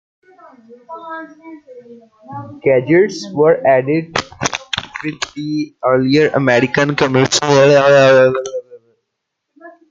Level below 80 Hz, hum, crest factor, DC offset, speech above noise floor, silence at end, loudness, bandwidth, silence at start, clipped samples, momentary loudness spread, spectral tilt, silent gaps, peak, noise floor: -54 dBFS; none; 16 dB; under 0.1%; 61 dB; 0.2 s; -13 LUFS; 9.2 kHz; 0.7 s; under 0.1%; 21 LU; -5 dB/octave; none; 0 dBFS; -75 dBFS